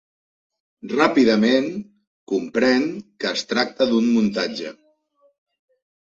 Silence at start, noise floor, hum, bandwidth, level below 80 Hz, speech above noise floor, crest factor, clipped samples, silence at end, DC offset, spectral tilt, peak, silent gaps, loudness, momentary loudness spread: 0.85 s; -62 dBFS; none; 7.6 kHz; -64 dBFS; 42 dB; 18 dB; under 0.1%; 1.4 s; under 0.1%; -5 dB/octave; -2 dBFS; 2.07-2.27 s; -20 LUFS; 13 LU